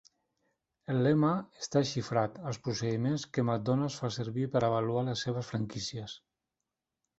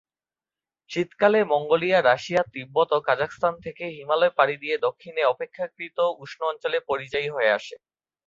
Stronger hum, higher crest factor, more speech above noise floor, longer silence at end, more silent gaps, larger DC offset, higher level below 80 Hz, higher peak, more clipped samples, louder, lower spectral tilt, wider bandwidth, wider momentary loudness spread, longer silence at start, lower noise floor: neither; about the same, 20 dB vs 20 dB; second, 57 dB vs over 66 dB; first, 1 s vs 0.5 s; neither; neither; about the same, -66 dBFS vs -66 dBFS; second, -14 dBFS vs -4 dBFS; neither; second, -32 LUFS vs -24 LUFS; about the same, -6 dB/octave vs -5 dB/octave; about the same, 8 kHz vs 7.6 kHz; about the same, 10 LU vs 11 LU; about the same, 0.9 s vs 0.9 s; about the same, -88 dBFS vs under -90 dBFS